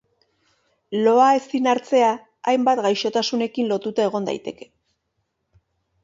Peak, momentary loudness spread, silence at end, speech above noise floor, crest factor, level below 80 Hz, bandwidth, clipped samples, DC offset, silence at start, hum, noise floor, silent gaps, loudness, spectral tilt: -4 dBFS; 12 LU; 1.5 s; 55 dB; 18 dB; -70 dBFS; 7.8 kHz; under 0.1%; under 0.1%; 0.9 s; none; -74 dBFS; none; -20 LUFS; -4.5 dB/octave